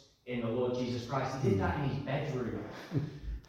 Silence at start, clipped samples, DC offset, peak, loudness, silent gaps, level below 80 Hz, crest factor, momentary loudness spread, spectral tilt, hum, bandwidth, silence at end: 0.25 s; under 0.1%; under 0.1%; -18 dBFS; -35 LUFS; none; -50 dBFS; 16 dB; 8 LU; -7.5 dB/octave; none; 13 kHz; 0.05 s